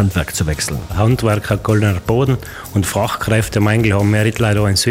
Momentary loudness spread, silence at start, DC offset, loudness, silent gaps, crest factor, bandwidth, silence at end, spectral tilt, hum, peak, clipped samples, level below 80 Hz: 5 LU; 0 s; under 0.1%; -16 LUFS; none; 14 dB; 16.5 kHz; 0 s; -5.5 dB/octave; none; 0 dBFS; under 0.1%; -32 dBFS